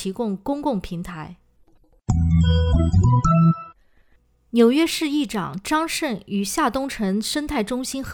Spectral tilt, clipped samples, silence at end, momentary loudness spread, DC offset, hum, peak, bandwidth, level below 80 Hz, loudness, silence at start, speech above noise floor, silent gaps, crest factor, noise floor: -6 dB/octave; under 0.1%; 0 s; 11 LU; under 0.1%; none; -4 dBFS; 19 kHz; -34 dBFS; -21 LUFS; 0 s; 38 dB; none; 18 dB; -59 dBFS